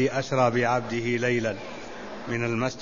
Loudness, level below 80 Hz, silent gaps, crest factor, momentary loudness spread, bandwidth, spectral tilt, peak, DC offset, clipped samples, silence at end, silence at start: -26 LUFS; -56 dBFS; none; 18 dB; 15 LU; 7.4 kHz; -5.5 dB/octave; -8 dBFS; 0.5%; under 0.1%; 0 s; 0 s